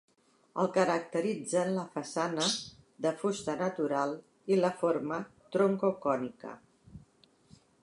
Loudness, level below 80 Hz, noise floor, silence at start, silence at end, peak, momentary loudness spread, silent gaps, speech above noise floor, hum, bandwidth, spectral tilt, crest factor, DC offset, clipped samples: -32 LUFS; -72 dBFS; -65 dBFS; 0.55 s; 0.85 s; -12 dBFS; 10 LU; none; 34 dB; none; 11.5 kHz; -4.5 dB/octave; 20 dB; under 0.1%; under 0.1%